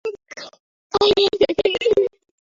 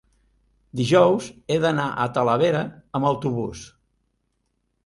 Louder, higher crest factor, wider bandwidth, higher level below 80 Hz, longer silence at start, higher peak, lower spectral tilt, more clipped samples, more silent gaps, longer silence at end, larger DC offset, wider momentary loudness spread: first, -18 LUFS vs -22 LUFS; about the same, 16 dB vs 20 dB; second, 7.6 kHz vs 11.5 kHz; about the same, -52 dBFS vs -56 dBFS; second, 0.05 s vs 0.75 s; about the same, -4 dBFS vs -4 dBFS; second, -4 dB/octave vs -6 dB/octave; neither; first, 0.60-0.90 s vs none; second, 0.45 s vs 1.2 s; neither; first, 21 LU vs 12 LU